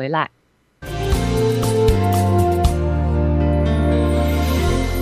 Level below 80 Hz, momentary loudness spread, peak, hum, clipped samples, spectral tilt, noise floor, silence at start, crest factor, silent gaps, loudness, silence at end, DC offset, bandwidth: -22 dBFS; 6 LU; -4 dBFS; none; under 0.1%; -6.5 dB/octave; -39 dBFS; 0 s; 14 dB; none; -18 LUFS; 0 s; under 0.1%; 15.5 kHz